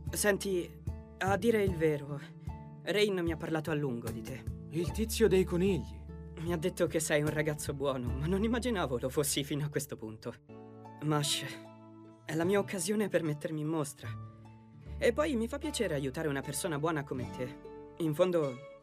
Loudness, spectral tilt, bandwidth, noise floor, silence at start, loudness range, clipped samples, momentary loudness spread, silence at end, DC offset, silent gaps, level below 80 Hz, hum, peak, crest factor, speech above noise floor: -33 LUFS; -5 dB/octave; 15.5 kHz; -53 dBFS; 0 s; 3 LU; under 0.1%; 16 LU; 0.05 s; under 0.1%; none; -50 dBFS; none; -14 dBFS; 18 dB; 21 dB